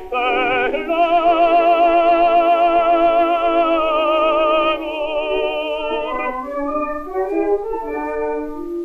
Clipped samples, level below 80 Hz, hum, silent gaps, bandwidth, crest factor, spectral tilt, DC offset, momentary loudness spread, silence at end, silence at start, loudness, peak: under 0.1%; -42 dBFS; none; none; 5.2 kHz; 12 dB; -5.5 dB/octave; under 0.1%; 10 LU; 0 s; 0 s; -17 LUFS; -4 dBFS